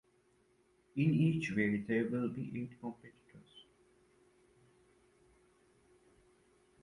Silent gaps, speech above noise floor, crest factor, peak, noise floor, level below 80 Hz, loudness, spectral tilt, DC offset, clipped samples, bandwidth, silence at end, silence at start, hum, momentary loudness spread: none; 37 dB; 20 dB; -20 dBFS; -72 dBFS; -72 dBFS; -36 LUFS; -8 dB/octave; under 0.1%; under 0.1%; 11 kHz; 3.2 s; 0.95 s; none; 26 LU